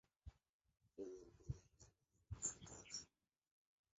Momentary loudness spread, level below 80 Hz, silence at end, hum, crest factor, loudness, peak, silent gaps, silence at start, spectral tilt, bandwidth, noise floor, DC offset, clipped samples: 19 LU; -66 dBFS; 0.9 s; none; 26 dB; -52 LUFS; -32 dBFS; 0.49-0.60 s; 0.25 s; -5.5 dB/octave; 8 kHz; -76 dBFS; under 0.1%; under 0.1%